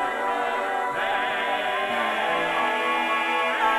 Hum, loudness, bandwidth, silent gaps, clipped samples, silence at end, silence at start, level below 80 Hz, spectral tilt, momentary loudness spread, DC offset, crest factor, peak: none; -24 LUFS; 15.5 kHz; none; under 0.1%; 0 s; 0 s; -64 dBFS; -2.5 dB/octave; 3 LU; under 0.1%; 14 dB; -10 dBFS